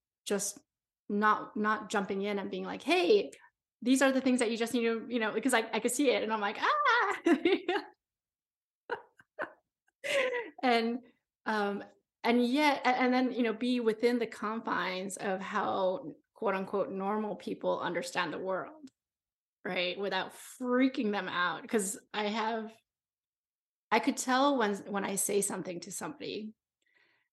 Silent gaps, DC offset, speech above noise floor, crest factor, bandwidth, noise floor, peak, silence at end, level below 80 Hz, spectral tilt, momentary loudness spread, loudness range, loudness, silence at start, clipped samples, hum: 0.99-1.08 s, 8.56-8.88 s, 9.95-9.99 s, 11.35-11.39 s, 19.33-19.64 s, 23.27-23.91 s; under 0.1%; over 59 dB; 20 dB; 12.5 kHz; under -90 dBFS; -12 dBFS; 0.8 s; -82 dBFS; -3.5 dB/octave; 13 LU; 6 LU; -31 LUFS; 0.25 s; under 0.1%; none